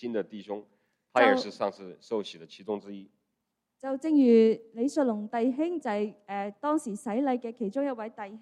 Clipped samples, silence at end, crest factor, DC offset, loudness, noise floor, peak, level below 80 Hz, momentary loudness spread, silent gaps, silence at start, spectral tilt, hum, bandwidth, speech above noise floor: under 0.1%; 0 s; 20 dB; under 0.1%; -28 LUFS; -82 dBFS; -8 dBFS; -80 dBFS; 17 LU; none; 0 s; -5.5 dB/octave; none; 11.5 kHz; 54 dB